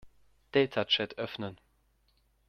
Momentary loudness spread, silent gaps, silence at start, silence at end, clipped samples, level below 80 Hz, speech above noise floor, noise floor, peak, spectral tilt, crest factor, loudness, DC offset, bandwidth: 12 LU; none; 0.05 s; 0.95 s; under 0.1%; -68 dBFS; 40 dB; -70 dBFS; -14 dBFS; -5.5 dB/octave; 22 dB; -31 LUFS; under 0.1%; 6.4 kHz